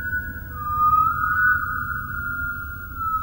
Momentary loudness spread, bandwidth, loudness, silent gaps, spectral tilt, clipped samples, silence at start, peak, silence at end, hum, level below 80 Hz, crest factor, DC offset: 13 LU; over 20 kHz; -22 LUFS; none; -6.5 dB/octave; under 0.1%; 0 s; -8 dBFS; 0 s; none; -38 dBFS; 14 dB; under 0.1%